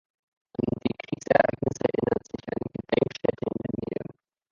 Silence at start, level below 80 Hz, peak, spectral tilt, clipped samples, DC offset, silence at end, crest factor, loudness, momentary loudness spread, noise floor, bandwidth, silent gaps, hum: 0.6 s; -56 dBFS; -4 dBFS; -6.5 dB/octave; under 0.1%; under 0.1%; 0.5 s; 24 dB; -28 LUFS; 12 LU; -45 dBFS; 7.6 kHz; none; none